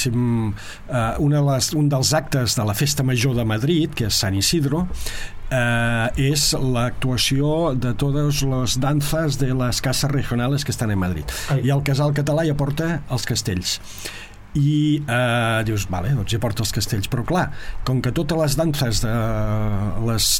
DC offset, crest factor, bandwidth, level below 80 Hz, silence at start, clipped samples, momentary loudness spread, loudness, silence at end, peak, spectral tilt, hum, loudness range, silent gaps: under 0.1%; 14 dB; 17 kHz; -34 dBFS; 0 s; under 0.1%; 6 LU; -21 LUFS; 0 s; -6 dBFS; -4.5 dB/octave; none; 3 LU; none